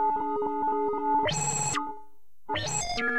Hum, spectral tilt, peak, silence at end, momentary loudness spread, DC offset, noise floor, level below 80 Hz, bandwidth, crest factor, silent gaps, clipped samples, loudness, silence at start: none; -2.5 dB/octave; -16 dBFS; 0 s; 7 LU; 0.9%; -58 dBFS; -52 dBFS; 15.5 kHz; 12 dB; none; under 0.1%; -28 LUFS; 0 s